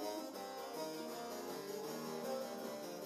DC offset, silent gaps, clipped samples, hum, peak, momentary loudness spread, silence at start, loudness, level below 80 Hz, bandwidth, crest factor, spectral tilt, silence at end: under 0.1%; none; under 0.1%; none; -32 dBFS; 3 LU; 0 s; -45 LUFS; -90 dBFS; 14 kHz; 14 dB; -3.5 dB/octave; 0 s